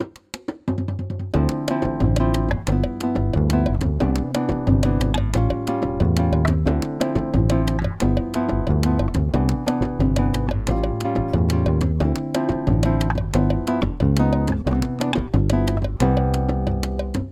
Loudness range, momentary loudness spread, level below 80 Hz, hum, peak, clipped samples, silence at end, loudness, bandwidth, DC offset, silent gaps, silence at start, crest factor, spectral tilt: 1 LU; 4 LU; -26 dBFS; none; -4 dBFS; under 0.1%; 0 s; -21 LUFS; 15 kHz; under 0.1%; none; 0 s; 16 dB; -7.5 dB/octave